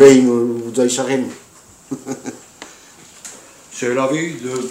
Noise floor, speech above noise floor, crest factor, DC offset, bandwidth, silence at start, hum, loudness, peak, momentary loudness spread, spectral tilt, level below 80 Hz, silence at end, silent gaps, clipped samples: -45 dBFS; 31 dB; 16 dB; under 0.1%; 15.5 kHz; 0 s; none; -18 LUFS; 0 dBFS; 21 LU; -4.5 dB/octave; -60 dBFS; 0 s; none; 0.3%